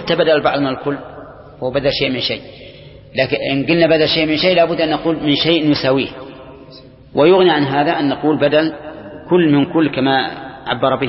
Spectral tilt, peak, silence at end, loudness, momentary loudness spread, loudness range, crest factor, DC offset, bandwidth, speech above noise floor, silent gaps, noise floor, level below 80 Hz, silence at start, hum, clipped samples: -9.5 dB/octave; 0 dBFS; 0 s; -15 LUFS; 14 LU; 4 LU; 16 dB; under 0.1%; 5.8 kHz; 25 dB; none; -40 dBFS; -46 dBFS; 0 s; none; under 0.1%